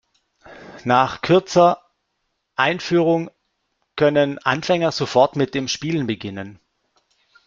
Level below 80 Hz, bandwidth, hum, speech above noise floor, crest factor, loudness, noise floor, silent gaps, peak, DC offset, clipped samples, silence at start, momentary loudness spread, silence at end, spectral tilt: -58 dBFS; 7.6 kHz; none; 55 dB; 18 dB; -19 LUFS; -74 dBFS; none; -2 dBFS; under 0.1%; under 0.1%; 0.5 s; 15 LU; 0.95 s; -5.5 dB/octave